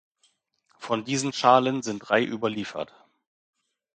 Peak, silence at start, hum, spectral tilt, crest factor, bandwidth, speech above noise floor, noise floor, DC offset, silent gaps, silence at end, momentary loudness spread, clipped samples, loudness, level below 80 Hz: -2 dBFS; 0.8 s; none; -4 dB/octave; 24 dB; 9.2 kHz; 44 dB; -69 dBFS; under 0.1%; none; 1.1 s; 16 LU; under 0.1%; -25 LUFS; -70 dBFS